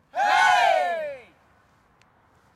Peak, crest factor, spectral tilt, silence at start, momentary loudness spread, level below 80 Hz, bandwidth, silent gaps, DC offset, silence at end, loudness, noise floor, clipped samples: -8 dBFS; 16 dB; 0 dB/octave; 0.15 s; 17 LU; -68 dBFS; 14 kHz; none; under 0.1%; 1.35 s; -20 LUFS; -60 dBFS; under 0.1%